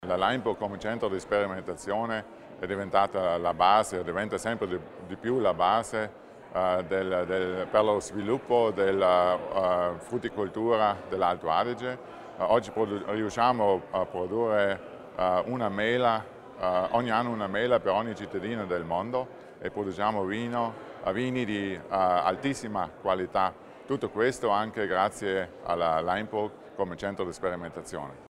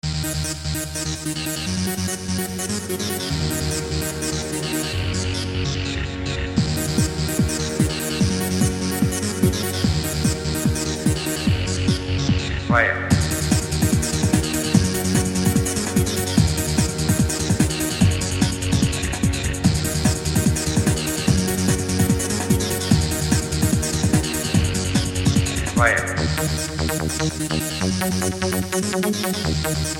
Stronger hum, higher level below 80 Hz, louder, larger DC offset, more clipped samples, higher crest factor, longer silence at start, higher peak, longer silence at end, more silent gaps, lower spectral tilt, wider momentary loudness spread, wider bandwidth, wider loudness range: neither; second, -60 dBFS vs -32 dBFS; second, -28 LUFS vs -21 LUFS; neither; neither; about the same, 20 dB vs 18 dB; about the same, 0 s vs 0.05 s; second, -8 dBFS vs -2 dBFS; about the same, 0.1 s vs 0 s; neither; about the same, -5.5 dB/octave vs -4.5 dB/octave; first, 10 LU vs 5 LU; second, 12.5 kHz vs 17 kHz; about the same, 4 LU vs 4 LU